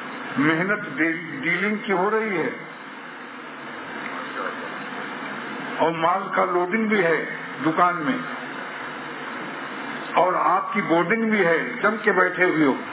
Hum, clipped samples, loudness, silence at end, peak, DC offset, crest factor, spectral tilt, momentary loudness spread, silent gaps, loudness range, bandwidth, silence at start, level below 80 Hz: none; under 0.1%; -23 LUFS; 0 s; -6 dBFS; under 0.1%; 18 dB; -9 dB/octave; 13 LU; none; 7 LU; 4 kHz; 0 s; -76 dBFS